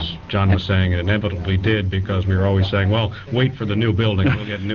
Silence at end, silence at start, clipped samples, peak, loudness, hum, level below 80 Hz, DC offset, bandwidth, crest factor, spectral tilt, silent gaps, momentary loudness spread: 0 s; 0 s; under 0.1%; -6 dBFS; -19 LUFS; none; -38 dBFS; 0.2%; 5.4 kHz; 14 dB; -5.5 dB/octave; none; 4 LU